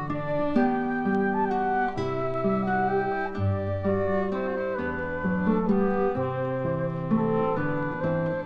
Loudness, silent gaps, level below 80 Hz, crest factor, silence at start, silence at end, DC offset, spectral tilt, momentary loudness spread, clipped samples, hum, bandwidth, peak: -26 LUFS; none; -48 dBFS; 14 dB; 0 s; 0 s; under 0.1%; -9.5 dB/octave; 4 LU; under 0.1%; none; 6.4 kHz; -12 dBFS